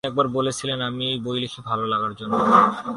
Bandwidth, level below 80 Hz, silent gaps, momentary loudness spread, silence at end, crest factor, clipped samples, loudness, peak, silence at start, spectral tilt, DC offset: 11.5 kHz; -58 dBFS; none; 10 LU; 0 s; 20 dB; under 0.1%; -22 LUFS; -2 dBFS; 0.05 s; -5 dB/octave; under 0.1%